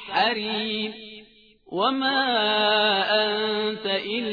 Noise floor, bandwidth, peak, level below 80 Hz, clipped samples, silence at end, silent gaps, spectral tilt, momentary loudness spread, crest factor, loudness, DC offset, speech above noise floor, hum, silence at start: -53 dBFS; 5 kHz; -8 dBFS; -68 dBFS; under 0.1%; 0 s; none; -5.5 dB/octave; 11 LU; 16 dB; -23 LUFS; under 0.1%; 30 dB; none; 0 s